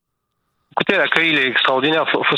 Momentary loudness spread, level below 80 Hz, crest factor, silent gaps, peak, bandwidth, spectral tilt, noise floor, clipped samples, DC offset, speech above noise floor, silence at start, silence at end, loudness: 6 LU; -66 dBFS; 18 dB; none; 0 dBFS; 12 kHz; -5 dB/octave; -73 dBFS; under 0.1%; under 0.1%; 56 dB; 0.75 s; 0 s; -16 LUFS